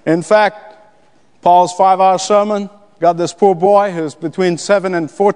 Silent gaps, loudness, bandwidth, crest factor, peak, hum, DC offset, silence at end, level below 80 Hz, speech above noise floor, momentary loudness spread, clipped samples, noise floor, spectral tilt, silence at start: none; -13 LUFS; 10.5 kHz; 14 dB; 0 dBFS; none; 0.3%; 0 s; -64 dBFS; 40 dB; 9 LU; under 0.1%; -53 dBFS; -5 dB/octave; 0.05 s